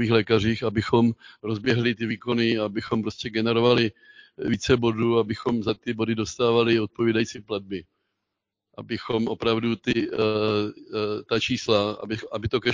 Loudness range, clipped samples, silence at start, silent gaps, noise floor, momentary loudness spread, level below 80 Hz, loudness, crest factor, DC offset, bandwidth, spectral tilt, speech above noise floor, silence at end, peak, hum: 3 LU; under 0.1%; 0 s; none; -83 dBFS; 10 LU; -50 dBFS; -24 LUFS; 20 dB; under 0.1%; 7.6 kHz; -6 dB/octave; 59 dB; 0 s; -4 dBFS; none